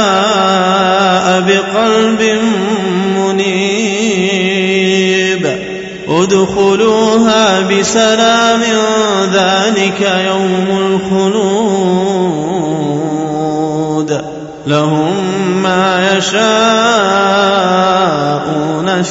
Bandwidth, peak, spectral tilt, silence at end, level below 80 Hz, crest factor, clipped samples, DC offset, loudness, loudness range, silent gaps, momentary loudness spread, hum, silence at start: 8 kHz; 0 dBFS; -4.5 dB/octave; 0 s; -48 dBFS; 12 dB; under 0.1%; under 0.1%; -11 LUFS; 4 LU; none; 6 LU; none; 0 s